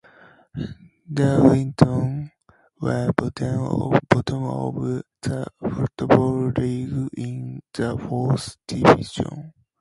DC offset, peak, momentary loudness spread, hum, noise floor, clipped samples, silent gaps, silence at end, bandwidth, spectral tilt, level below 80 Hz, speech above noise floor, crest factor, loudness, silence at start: under 0.1%; 0 dBFS; 16 LU; none; -59 dBFS; under 0.1%; none; 0.3 s; 11.5 kHz; -7.5 dB/octave; -46 dBFS; 37 dB; 22 dB; -22 LUFS; 0.55 s